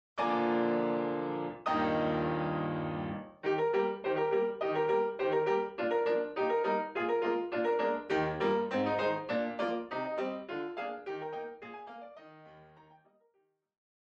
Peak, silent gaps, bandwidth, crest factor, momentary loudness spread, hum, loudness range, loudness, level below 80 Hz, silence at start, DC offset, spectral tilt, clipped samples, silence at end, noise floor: -18 dBFS; none; 7.2 kHz; 14 dB; 9 LU; none; 9 LU; -33 LUFS; -66 dBFS; 0.15 s; under 0.1%; -7.5 dB/octave; under 0.1%; 1.45 s; -76 dBFS